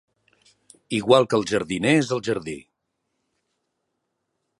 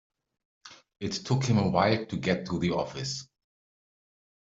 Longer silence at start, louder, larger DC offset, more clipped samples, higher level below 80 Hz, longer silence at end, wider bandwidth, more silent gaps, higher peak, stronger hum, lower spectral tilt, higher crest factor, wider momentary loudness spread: first, 0.9 s vs 0.65 s; first, -21 LUFS vs -29 LUFS; neither; neither; about the same, -60 dBFS vs -60 dBFS; first, 2 s vs 1.2 s; first, 11.5 kHz vs 7.8 kHz; neither; first, -2 dBFS vs -10 dBFS; neither; about the same, -5 dB/octave vs -5.5 dB/octave; about the same, 24 dB vs 20 dB; about the same, 12 LU vs 10 LU